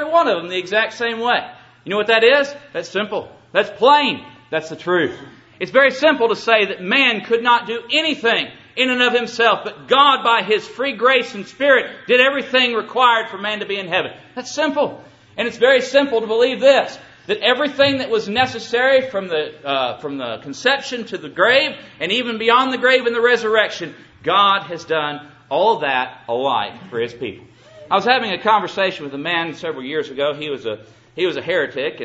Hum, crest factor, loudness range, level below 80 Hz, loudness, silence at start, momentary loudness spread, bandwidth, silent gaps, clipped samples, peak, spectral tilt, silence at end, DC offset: none; 18 dB; 4 LU; -62 dBFS; -17 LUFS; 0 s; 12 LU; 8 kHz; none; under 0.1%; 0 dBFS; -3.5 dB/octave; 0 s; under 0.1%